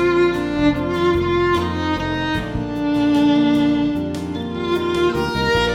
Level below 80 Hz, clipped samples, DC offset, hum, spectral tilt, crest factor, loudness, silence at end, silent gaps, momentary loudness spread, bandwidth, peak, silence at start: -36 dBFS; under 0.1%; under 0.1%; none; -6.5 dB/octave; 14 dB; -19 LUFS; 0 s; none; 8 LU; 13.5 kHz; -4 dBFS; 0 s